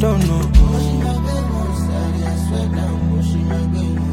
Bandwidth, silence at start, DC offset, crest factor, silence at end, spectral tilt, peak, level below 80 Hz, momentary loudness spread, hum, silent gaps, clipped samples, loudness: 15.5 kHz; 0 s; under 0.1%; 16 dB; 0 s; -7.5 dB/octave; 0 dBFS; -20 dBFS; 6 LU; none; none; under 0.1%; -18 LUFS